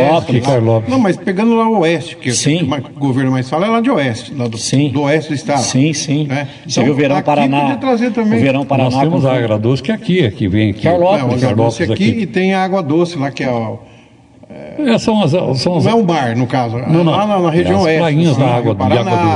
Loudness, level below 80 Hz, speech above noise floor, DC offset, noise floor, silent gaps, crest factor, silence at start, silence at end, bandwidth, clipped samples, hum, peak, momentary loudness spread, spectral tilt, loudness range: -14 LUFS; -50 dBFS; 29 dB; under 0.1%; -42 dBFS; none; 12 dB; 0 s; 0 s; 11 kHz; under 0.1%; none; 0 dBFS; 6 LU; -6 dB/octave; 3 LU